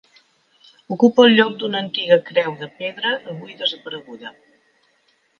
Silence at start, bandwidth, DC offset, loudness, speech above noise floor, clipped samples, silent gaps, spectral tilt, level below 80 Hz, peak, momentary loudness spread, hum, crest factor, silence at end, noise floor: 0.9 s; 6.8 kHz; under 0.1%; -18 LUFS; 44 dB; under 0.1%; none; -5.5 dB/octave; -70 dBFS; 0 dBFS; 21 LU; none; 20 dB; 1.1 s; -63 dBFS